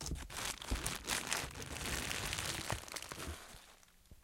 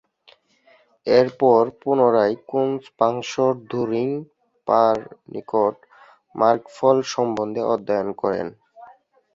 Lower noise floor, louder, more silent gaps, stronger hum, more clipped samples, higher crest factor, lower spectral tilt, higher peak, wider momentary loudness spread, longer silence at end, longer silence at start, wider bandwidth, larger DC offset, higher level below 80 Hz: first, -63 dBFS vs -57 dBFS; second, -40 LUFS vs -21 LUFS; neither; neither; neither; first, 30 dB vs 18 dB; second, -2 dB/octave vs -6 dB/octave; second, -12 dBFS vs -2 dBFS; about the same, 11 LU vs 11 LU; second, 0.05 s vs 0.5 s; second, 0 s vs 1.05 s; first, 17 kHz vs 7.6 kHz; neither; first, -50 dBFS vs -64 dBFS